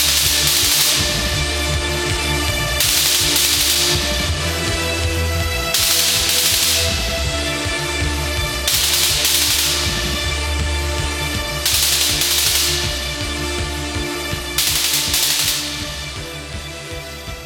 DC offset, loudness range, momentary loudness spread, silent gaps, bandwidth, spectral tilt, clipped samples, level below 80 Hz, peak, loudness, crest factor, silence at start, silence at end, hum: under 0.1%; 3 LU; 10 LU; none; over 20 kHz; -1.5 dB/octave; under 0.1%; -30 dBFS; -2 dBFS; -16 LUFS; 16 dB; 0 s; 0 s; none